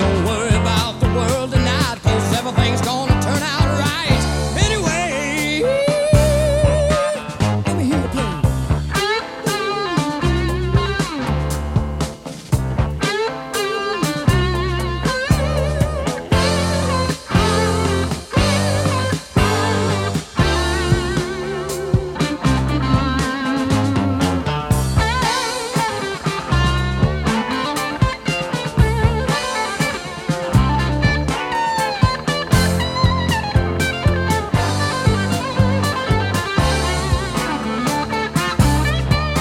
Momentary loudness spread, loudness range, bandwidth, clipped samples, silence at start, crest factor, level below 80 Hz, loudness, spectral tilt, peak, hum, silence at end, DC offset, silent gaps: 5 LU; 3 LU; 17 kHz; under 0.1%; 0 s; 16 dB; -26 dBFS; -18 LUFS; -5 dB/octave; -2 dBFS; none; 0 s; under 0.1%; none